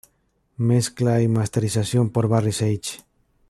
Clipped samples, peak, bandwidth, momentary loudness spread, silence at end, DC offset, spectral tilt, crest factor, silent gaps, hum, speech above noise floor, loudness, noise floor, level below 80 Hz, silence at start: under 0.1%; -6 dBFS; 13 kHz; 7 LU; 0.55 s; under 0.1%; -6 dB/octave; 16 dB; none; none; 46 dB; -21 LUFS; -67 dBFS; -56 dBFS; 0.6 s